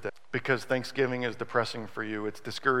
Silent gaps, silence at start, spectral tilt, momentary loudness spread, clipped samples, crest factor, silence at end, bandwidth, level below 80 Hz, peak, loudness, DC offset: none; 0 s; -5 dB/octave; 7 LU; under 0.1%; 20 dB; 0 s; 16 kHz; -72 dBFS; -10 dBFS; -31 LUFS; 0.6%